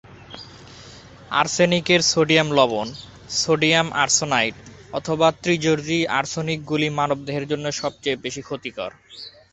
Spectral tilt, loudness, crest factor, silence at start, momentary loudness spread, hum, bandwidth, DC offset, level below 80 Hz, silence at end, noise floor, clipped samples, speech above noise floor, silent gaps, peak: -3.5 dB/octave; -20 LUFS; 20 dB; 0.05 s; 21 LU; none; 8.4 kHz; under 0.1%; -54 dBFS; 0.25 s; -43 dBFS; under 0.1%; 22 dB; none; -2 dBFS